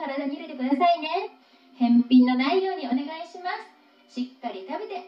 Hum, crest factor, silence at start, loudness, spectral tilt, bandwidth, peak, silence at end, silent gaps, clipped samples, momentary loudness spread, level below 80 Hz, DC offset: none; 16 dB; 0 s; -25 LUFS; -6 dB/octave; 6 kHz; -8 dBFS; 0 s; none; under 0.1%; 16 LU; -86 dBFS; under 0.1%